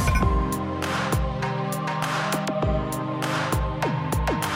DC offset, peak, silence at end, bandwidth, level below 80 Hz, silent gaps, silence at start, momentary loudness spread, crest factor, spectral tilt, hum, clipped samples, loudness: under 0.1%; -8 dBFS; 0 s; 16.5 kHz; -32 dBFS; none; 0 s; 4 LU; 16 dB; -5.5 dB/octave; none; under 0.1%; -25 LUFS